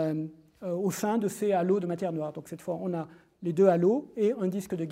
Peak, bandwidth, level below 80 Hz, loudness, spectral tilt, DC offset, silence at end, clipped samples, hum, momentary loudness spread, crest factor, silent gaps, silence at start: -10 dBFS; 16 kHz; -72 dBFS; -29 LUFS; -7 dB/octave; under 0.1%; 0 s; under 0.1%; none; 13 LU; 20 dB; none; 0 s